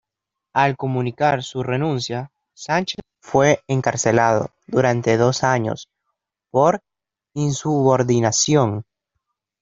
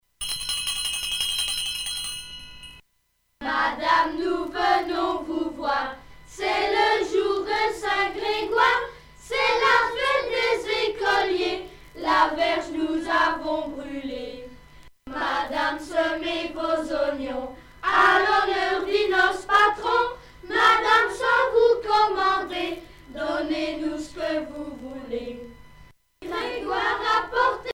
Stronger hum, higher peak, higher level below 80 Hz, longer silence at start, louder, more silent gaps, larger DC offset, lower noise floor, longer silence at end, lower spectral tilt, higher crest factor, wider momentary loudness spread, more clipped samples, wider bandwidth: neither; about the same, -2 dBFS vs -4 dBFS; second, -56 dBFS vs -50 dBFS; first, 0.55 s vs 0.2 s; first, -19 LUFS vs -23 LUFS; neither; neither; first, -84 dBFS vs -70 dBFS; first, 0.8 s vs 0 s; first, -5 dB/octave vs -2 dB/octave; about the same, 18 dB vs 20 dB; second, 11 LU vs 15 LU; neither; second, 7.8 kHz vs over 20 kHz